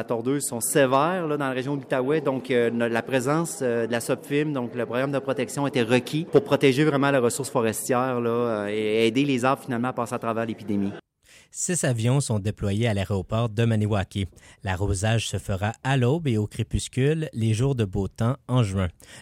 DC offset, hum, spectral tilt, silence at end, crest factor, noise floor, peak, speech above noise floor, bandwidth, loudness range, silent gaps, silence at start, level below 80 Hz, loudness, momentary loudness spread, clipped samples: under 0.1%; none; -5.5 dB/octave; 0 s; 18 dB; -56 dBFS; -6 dBFS; 32 dB; 16 kHz; 3 LU; none; 0 s; -48 dBFS; -24 LUFS; 7 LU; under 0.1%